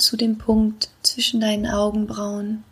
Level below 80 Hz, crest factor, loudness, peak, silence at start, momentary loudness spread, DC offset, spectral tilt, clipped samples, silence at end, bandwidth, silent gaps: -42 dBFS; 20 dB; -21 LUFS; -2 dBFS; 0 s; 8 LU; under 0.1%; -3.5 dB/octave; under 0.1%; 0.1 s; 15.5 kHz; none